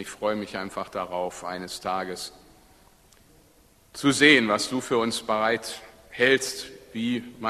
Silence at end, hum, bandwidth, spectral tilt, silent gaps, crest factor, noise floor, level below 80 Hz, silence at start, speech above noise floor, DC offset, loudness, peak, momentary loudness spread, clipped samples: 0 s; none; 13.5 kHz; -3 dB/octave; none; 22 dB; -58 dBFS; -62 dBFS; 0 s; 33 dB; under 0.1%; -24 LUFS; -4 dBFS; 18 LU; under 0.1%